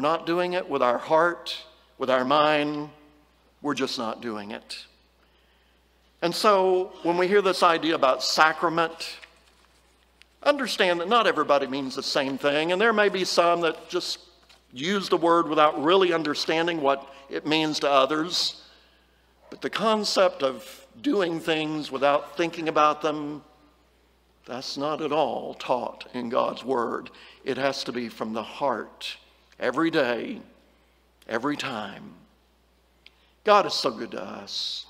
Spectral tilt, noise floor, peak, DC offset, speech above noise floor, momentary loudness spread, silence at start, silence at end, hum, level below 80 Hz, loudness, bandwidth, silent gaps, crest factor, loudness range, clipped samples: -4 dB/octave; -63 dBFS; -2 dBFS; under 0.1%; 38 dB; 15 LU; 0 s; 0.05 s; none; -66 dBFS; -24 LUFS; 16 kHz; none; 24 dB; 7 LU; under 0.1%